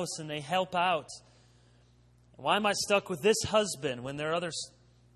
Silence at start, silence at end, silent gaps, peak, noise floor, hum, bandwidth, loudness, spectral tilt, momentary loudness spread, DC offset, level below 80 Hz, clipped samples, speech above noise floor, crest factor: 0 s; 0.45 s; none; -14 dBFS; -62 dBFS; 60 Hz at -60 dBFS; 13 kHz; -30 LUFS; -3 dB/octave; 11 LU; under 0.1%; -62 dBFS; under 0.1%; 31 dB; 18 dB